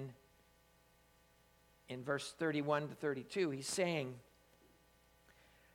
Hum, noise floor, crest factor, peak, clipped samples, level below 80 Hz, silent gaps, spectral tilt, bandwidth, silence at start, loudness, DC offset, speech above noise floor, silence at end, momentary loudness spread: none; -70 dBFS; 22 dB; -22 dBFS; under 0.1%; -76 dBFS; none; -4.5 dB/octave; 19 kHz; 0 s; -40 LUFS; under 0.1%; 31 dB; 1.5 s; 12 LU